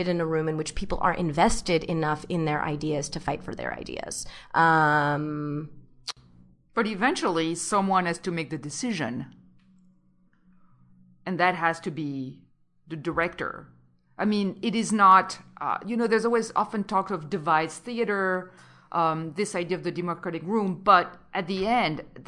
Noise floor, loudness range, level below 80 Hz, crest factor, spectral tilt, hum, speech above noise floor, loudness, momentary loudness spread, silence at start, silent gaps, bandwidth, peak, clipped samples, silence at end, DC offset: -62 dBFS; 7 LU; -48 dBFS; 22 dB; -5 dB/octave; none; 36 dB; -26 LUFS; 14 LU; 0 s; none; 12 kHz; -6 dBFS; under 0.1%; 0.05 s; under 0.1%